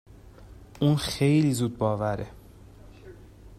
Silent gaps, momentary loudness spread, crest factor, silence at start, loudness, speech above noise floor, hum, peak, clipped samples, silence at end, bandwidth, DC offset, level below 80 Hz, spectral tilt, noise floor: none; 10 LU; 18 dB; 0.25 s; -25 LUFS; 24 dB; none; -10 dBFS; under 0.1%; 0 s; 13.5 kHz; under 0.1%; -50 dBFS; -6.5 dB/octave; -49 dBFS